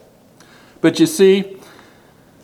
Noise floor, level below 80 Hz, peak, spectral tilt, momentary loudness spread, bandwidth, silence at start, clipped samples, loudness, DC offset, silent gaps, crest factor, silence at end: -48 dBFS; -64 dBFS; 0 dBFS; -5 dB/octave; 7 LU; 17.5 kHz; 0.85 s; under 0.1%; -14 LUFS; under 0.1%; none; 18 dB; 0.9 s